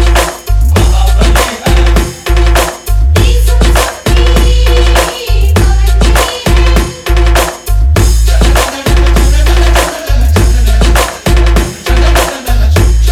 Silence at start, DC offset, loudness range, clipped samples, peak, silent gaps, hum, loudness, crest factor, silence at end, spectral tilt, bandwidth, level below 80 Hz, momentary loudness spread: 0 s; under 0.1%; 1 LU; 0.3%; 0 dBFS; none; none; -9 LUFS; 6 dB; 0 s; -4.5 dB/octave; 16 kHz; -8 dBFS; 4 LU